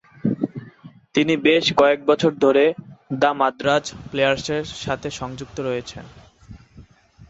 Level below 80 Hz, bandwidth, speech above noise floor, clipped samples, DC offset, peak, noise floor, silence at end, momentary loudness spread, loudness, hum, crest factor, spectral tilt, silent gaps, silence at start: -52 dBFS; 8 kHz; 28 dB; under 0.1%; under 0.1%; -4 dBFS; -48 dBFS; 0.05 s; 14 LU; -20 LUFS; none; 18 dB; -5 dB/octave; none; 0.25 s